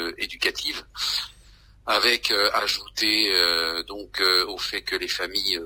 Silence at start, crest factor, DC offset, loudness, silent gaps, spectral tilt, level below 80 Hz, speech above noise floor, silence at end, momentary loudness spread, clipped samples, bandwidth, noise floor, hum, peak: 0 s; 20 dB; under 0.1%; -22 LUFS; none; -0.5 dB/octave; -52 dBFS; 28 dB; 0 s; 10 LU; under 0.1%; 16 kHz; -52 dBFS; none; -4 dBFS